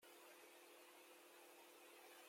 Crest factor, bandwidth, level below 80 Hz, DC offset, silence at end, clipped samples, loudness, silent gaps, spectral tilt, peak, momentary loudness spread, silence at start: 14 dB; 16.5 kHz; under -90 dBFS; under 0.1%; 0 s; under 0.1%; -64 LUFS; none; 0 dB/octave; -52 dBFS; 1 LU; 0 s